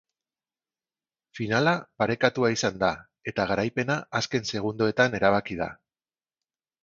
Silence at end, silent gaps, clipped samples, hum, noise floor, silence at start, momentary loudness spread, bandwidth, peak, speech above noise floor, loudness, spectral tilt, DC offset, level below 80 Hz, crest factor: 1.1 s; none; under 0.1%; none; under -90 dBFS; 1.35 s; 10 LU; 7.8 kHz; -4 dBFS; over 64 dB; -26 LUFS; -5 dB/octave; under 0.1%; -58 dBFS; 24 dB